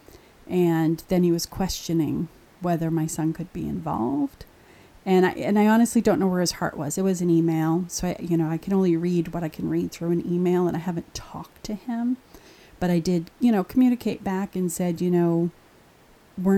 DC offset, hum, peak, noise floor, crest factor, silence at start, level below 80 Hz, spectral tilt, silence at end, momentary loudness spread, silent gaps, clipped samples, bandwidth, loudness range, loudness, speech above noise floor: under 0.1%; none; -8 dBFS; -54 dBFS; 16 dB; 0.5 s; -50 dBFS; -6.5 dB/octave; 0 s; 10 LU; none; under 0.1%; 16 kHz; 5 LU; -24 LUFS; 31 dB